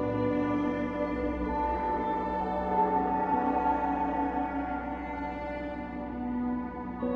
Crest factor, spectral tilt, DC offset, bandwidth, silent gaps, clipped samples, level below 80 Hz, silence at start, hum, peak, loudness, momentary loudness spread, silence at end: 16 dB; -9 dB/octave; under 0.1%; 6.6 kHz; none; under 0.1%; -46 dBFS; 0 s; none; -16 dBFS; -31 LUFS; 8 LU; 0 s